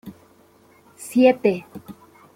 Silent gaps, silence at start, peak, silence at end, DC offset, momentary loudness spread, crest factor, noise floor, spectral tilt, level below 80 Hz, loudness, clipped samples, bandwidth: none; 0.05 s; -2 dBFS; 0.45 s; under 0.1%; 24 LU; 20 dB; -54 dBFS; -5.5 dB/octave; -66 dBFS; -19 LUFS; under 0.1%; 16 kHz